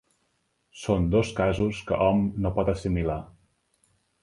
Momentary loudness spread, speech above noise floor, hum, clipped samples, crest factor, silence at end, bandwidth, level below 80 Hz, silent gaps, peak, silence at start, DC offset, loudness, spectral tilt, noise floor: 6 LU; 48 dB; none; under 0.1%; 18 dB; 0.95 s; 11.5 kHz; -40 dBFS; none; -8 dBFS; 0.75 s; under 0.1%; -26 LUFS; -7.5 dB/octave; -73 dBFS